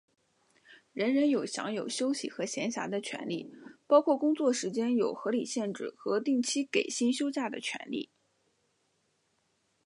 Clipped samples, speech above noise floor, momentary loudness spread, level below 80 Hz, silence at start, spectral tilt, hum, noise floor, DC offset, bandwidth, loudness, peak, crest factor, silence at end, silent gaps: under 0.1%; 45 dB; 11 LU; -86 dBFS; 0.7 s; -3.5 dB/octave; none; -75 dBFS; under 0.1%; 11.5 kHz; -31 LUFS; -10 dBFS; 22 dB; 1.8 s; none